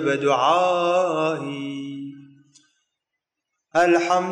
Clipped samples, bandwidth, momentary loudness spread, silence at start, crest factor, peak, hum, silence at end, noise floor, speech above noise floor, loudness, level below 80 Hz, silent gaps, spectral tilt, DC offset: under 0.1%; 10.5 kHz; 15 LU; 0 s; 16 dB; -8 dBFS; none; 0 s; -83 dBFS; 63 dB; -21 LUFS; -74 dBFS; none; -5 dB/octave; under 0.1%